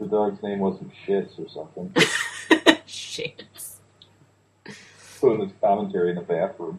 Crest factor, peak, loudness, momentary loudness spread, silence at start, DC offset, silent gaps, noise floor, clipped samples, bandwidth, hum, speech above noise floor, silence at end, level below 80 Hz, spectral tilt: 24 dB; 0 dBFS; -23 LUFS; 19 LU; 0 s; under 0.1%; none; -59 dBFS; under 0.1%; 15 kHz; none; 35 dB; 0 s; -66 dBFS; -4 dB/octave